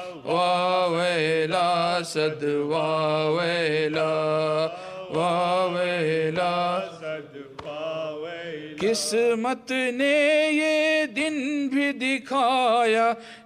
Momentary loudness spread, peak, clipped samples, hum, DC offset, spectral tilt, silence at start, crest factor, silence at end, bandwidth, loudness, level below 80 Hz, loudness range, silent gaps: 12 LU; -10 dBFS; under 0.1%; none; under 0.1%; -4.5 dB/octave; 0 s; 14 dB; 0.05 s; 15 kHz; -24 LUFS; -68 dBFS; 5 LU; none